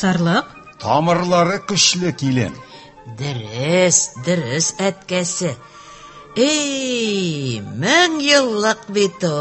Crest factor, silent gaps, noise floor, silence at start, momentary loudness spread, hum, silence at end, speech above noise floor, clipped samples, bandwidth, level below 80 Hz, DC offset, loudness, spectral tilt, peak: 18 dB; none; -39 dBFS; 0 s; 12 LU; none; 0 s; 22 dB; under 0.1%; 8.6 kHz; -54 dBFS; under 0.1%; -17 LUFS; -3.5 dB/octave; 0 dBFS